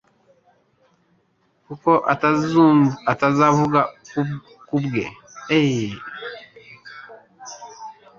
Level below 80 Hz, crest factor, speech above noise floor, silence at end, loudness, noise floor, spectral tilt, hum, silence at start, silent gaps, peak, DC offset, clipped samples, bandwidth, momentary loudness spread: -58 dBFS; 20 dB; 46 dB; 0.25 s; -19 LUFS; -64 dBFS; -6.5 dB/octave; none; 1.7 s; none; -2 dBFS; under 0.1%; under 0.1%; 7.4 kHz; 24 LU